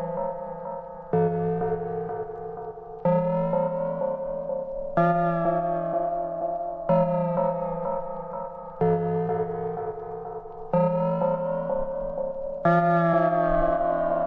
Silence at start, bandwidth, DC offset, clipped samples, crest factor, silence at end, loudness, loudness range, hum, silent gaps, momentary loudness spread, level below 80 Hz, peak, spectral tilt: 0 s; 4.4 kHz; under 0.1%; under 0.1%; 16 dB; 0 s; -26 LUFS; 4 LU; none; none; 13 LU; -46 dBFS; -10 dBFS; -11 dB/octave